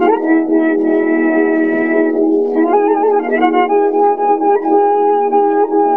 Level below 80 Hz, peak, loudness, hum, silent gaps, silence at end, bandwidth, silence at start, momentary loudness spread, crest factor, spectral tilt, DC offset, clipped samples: -68 dBFS; 0 dBFS; -13 LUFS; none; none; 0 s; 3.4 kHz; 0 s; 1 LU; 12 dB; -8 dB/octave; 0.7%; under 0.1%